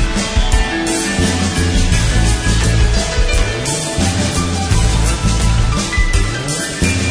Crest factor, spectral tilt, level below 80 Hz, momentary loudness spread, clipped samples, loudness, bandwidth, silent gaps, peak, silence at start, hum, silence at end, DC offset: 14 dB; -4 dB/octave; -18 dBFS; 3 LU; under 0.1%; -15 LUFS; 11 kHz; none; 0 dBFS; 0 s; none; 0 s; under 0.1%